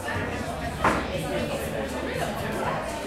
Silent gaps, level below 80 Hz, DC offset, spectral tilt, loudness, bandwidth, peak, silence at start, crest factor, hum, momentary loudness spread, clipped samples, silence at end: none; -42 dBFS; under 0.1%; -5 dB/octave; -28 LUFS; 16 kHz; -10 dBFS; 0 s; 20 dB; none; 5 LU; under 0.1%; 0 s